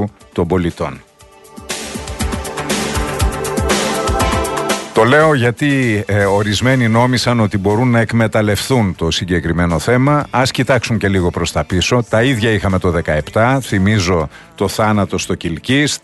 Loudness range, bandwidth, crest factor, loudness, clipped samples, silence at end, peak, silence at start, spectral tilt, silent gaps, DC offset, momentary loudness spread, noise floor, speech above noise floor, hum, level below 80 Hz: 5 LU; 12.5 kHz; 14 dB; -15 LUFS; under 0.1%; 0.05 s; 0 dBFS; 0 s; -5 dB/octave; none; under 0.1%; 8 LU; -42 dBFS; 28 dB; none; -30 dBFS